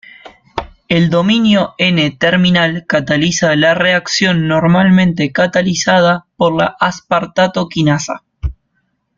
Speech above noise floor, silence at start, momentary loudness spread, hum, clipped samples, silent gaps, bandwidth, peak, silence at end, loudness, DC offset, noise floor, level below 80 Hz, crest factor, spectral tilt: 52 dB; 0.25 s; 12 LU; none; under 0.1%; none; 7.6 kHz; 0 dBFS; 0.65 s; -12 LUFS; under 0.1%; -65 dBFS; -38 dBFS; 12 dB; -5 dB/octave